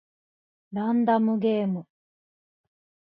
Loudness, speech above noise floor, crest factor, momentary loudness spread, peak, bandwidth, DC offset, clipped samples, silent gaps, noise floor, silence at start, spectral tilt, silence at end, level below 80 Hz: -25 LUFS; over 66 dB; 16 dB; 11 LU; -12 dBFS; 4.7 kHz; under 0.1%; under 0.1%; none; under -90 dBFS; 0.7 s; -11 dB/octave; 1.25 s; -76 dBFS